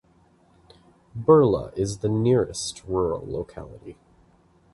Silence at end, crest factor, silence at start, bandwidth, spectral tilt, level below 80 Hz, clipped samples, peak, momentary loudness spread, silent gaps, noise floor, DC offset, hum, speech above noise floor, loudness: 0.8 s; 20 dB; 1.15 s; 11.5 kHz; -6.5 dB/octave; -48 dBFS; under 0.1%; -6 dBFS; 23 LU; none; -59 dBFS; under 0.1%; none; 36 dB; -23 LUFS